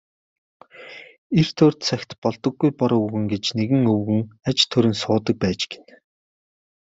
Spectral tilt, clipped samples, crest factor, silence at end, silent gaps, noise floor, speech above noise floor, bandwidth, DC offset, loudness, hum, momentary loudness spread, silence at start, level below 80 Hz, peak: -6 dB/octave; under 0.1%; 20 dB; 1.2 s; 1.18-1.30 s, 2.18-2.22 s; -42 dBFS; 22 dB; 8 kHz; under 0.1%; -21 LUFS; none; 11 LU; 0.8 s; -58 dBFS; -2 dBFS